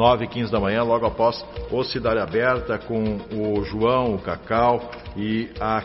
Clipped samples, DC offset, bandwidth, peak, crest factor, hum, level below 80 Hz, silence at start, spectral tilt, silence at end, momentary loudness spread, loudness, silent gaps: under 0.1%; under 0.1%; 6 kHz; -4 dBFS; 18 dB; none; -42 dBFS; 0 s; -4.5 dB/octave; 0 s; 7 LU; -23 LUFS; none